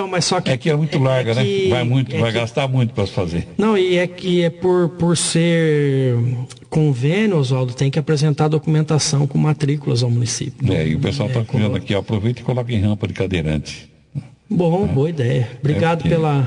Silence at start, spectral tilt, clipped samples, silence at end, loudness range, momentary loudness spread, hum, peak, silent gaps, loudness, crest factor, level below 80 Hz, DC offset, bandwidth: 0 s; -6 dB/octave; under 0.1%; 0 s; 3 LU; 6 LU; none; -4 dBFS; none; -18 LUFS; 12 dB; -48 dBFS; under 0.1%; 10.5 kHz